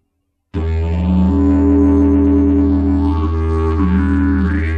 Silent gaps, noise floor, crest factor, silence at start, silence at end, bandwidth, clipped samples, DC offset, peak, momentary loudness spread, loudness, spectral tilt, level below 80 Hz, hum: none; -69 dBFS; 10 dB; 0.55 s; 0 s; 4.8 kHz; under 0.1%; under 0.1%; -4 dBFS; 7 LU; -14 LUFS; -10 dB/octave; -20 dBFS; none